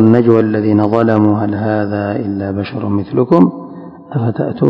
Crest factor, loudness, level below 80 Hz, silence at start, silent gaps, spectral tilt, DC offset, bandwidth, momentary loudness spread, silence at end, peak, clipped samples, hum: 12 dB; -14 LUFS; -44 dBFS; 0 s; none; -10.5 dB/octave; under 0.1%; 5.4 kHz; 9 LU; 0 s; 0 dBFS; 0.7%; none